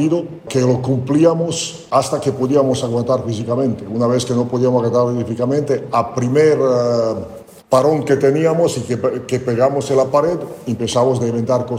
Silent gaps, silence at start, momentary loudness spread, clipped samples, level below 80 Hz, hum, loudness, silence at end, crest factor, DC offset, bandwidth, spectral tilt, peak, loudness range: none; 0 s; 6 LU; under 0.1%; -52 dBFS; none; -17 LUFS; 0 s; 14 dB; under 0.1%; 16 kHz; -6.5 dB/octave; -2 dBFS; 2 LU